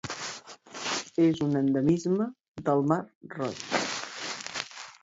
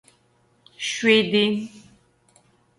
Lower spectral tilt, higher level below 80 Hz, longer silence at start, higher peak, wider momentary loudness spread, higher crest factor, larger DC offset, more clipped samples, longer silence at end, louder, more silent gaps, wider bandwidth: about the same, -5 dB/octave vs -4 dB/octave; about the same, -64 dBFS vs -68 dBFS; second, 0.05 s vs 0.8 s; second, -12 dBFS vs -4 dBFS; about the same, 12 LU vs 13 LU; about the same, 18 dB vs 20 dB; neither; neither; second, 0.1 s vs 1 s; second, -29 LUFS vs -20 LUFS; first, 2.48-2.55 s, 3.15-3.21 s vs none; second, 8 kHz vs 11.5 kHz